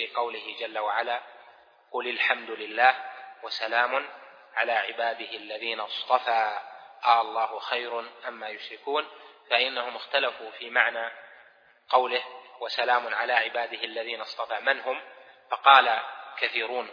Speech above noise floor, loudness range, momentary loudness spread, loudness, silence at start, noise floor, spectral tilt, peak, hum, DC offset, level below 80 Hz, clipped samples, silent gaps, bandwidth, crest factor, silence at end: 30 dB; 4 LU; 14 LU; -26 LUFS; 0 s; -57 dBFS; -1.5 dB/octave; -2 dBFS; none; under 0.1%; under -90 dBFS; under 0.1%; none; 5.4 kHz; 26 dB; 0 s